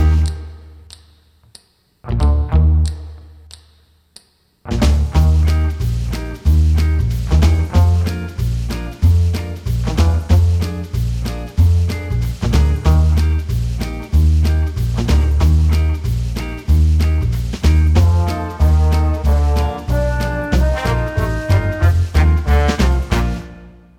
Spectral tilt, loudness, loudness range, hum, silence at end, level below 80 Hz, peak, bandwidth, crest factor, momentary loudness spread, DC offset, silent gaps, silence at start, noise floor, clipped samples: -7 dB/octave; -16 LUFS; 4 LU; none; 0.3 s; -18 dBFS; 0 dBFS; 14 kHz; 14 dB; 8 LU; under 0.1%; none; 0 s; -52 dBFS; under 0.1%